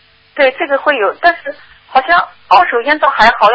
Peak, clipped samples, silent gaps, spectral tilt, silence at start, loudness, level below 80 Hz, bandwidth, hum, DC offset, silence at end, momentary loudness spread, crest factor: 0 dBFS; 0.3%; none; -3.5 dB/octave; 0.35 s; -11 LUFS; -46 dBFS; 8 kHz; none; under 0.1%; 0 s; 7 LU; 12 dB